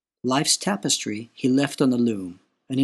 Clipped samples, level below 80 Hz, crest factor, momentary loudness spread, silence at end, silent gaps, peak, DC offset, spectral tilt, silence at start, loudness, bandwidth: under 0.1%; -70 dBFS; 16 dB; 11 LU; 0 s; none; -6 dBFS; under 0.1%; -3.5 dB/octave; 0.25 s; -23 LUFS; 12.5 kHz